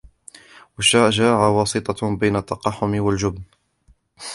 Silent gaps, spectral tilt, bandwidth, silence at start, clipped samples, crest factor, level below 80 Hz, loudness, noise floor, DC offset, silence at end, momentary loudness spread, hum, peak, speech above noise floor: none; -4.5 dB/octave; 11.5 kHz; 0.8 s; under 0.1%; 20 dB; -46 dBFS; -19 LUFS; -58 dBFS; under 0.1%; 0 s; 10 LU; none; -2 dBFS; 39 dB